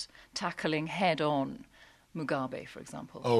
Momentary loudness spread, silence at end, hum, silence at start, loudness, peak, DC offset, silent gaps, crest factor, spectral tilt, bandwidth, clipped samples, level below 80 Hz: 15 LU; 0 s; none; 0 s; -33 LUFS; -14 dBFS; under 0.1%; none; 20 dB; -5.5 dB/octave; 13.5 kHz; under 0.1%; -68 dBFS